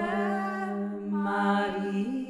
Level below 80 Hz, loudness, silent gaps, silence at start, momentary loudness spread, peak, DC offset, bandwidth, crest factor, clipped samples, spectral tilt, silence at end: -66 dBFS; -29 LUFS; none; 0 s; 6 LU; -14 dBFS; under 0.1%; 10.5 kHz; 16 dB; under 0.1%; -7 dB/octave; 0 s